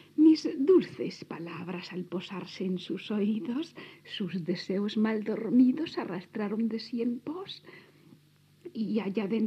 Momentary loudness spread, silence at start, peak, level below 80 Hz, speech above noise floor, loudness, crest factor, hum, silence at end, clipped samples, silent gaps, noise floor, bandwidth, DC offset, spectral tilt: 16 LU; 0.15 s; -12 dBFS; -84 dBFS; 31 dB; -30 LUFS; 18 dB; none; 0 s; under 0.1%; none; -62 dBFS; 8.4 kHz; under 0.1%; -7 dB/octave